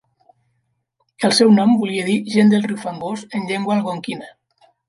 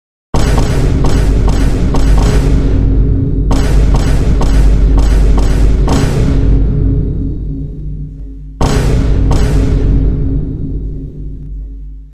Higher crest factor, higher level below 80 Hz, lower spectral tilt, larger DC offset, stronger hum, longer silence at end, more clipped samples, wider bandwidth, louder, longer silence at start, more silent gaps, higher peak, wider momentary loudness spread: first, 16 dB vs 10 dB; second, -66 dBFS vs -12 dBFS; second, -5.5 dB/octave vs -7 dB/octave; second, under 0.1% vs 5%; neither; first, 0.6 s vs 0 s; neither; about the same, 11.5 kHz vs 11 kHz; second, -17 LUFS vs -13 LUFS; first, 1.2 s vs 0.35 s; neither; about the same, -2 dBFS vs 0 dBFS; about the same, 15 LU vs 14 LU